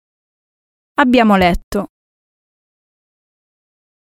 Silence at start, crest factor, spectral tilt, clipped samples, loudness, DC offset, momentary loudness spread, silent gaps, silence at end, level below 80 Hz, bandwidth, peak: 1 s; 18 dB; -6.5 dB/octave; under 0.1%; -14 LUFS; under 0.1%; 13 LU; 1.64-1.72 s; 2.3 s; -36 dBFS; 15.5 kHz; 0 dBFS